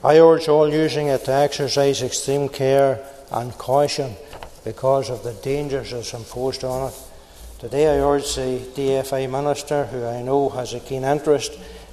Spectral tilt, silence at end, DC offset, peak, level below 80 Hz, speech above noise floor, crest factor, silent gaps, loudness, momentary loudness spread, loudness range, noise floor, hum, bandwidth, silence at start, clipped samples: -5 dB/octave; 0 s; under 0.1%; 0 dBFS; -44 dBFS; 21 dB; 20 dB; none; -21 LUFS; 13 LU; 6 LU; -40 dBFS; none; 14 kHz; 0 s; under 0.1%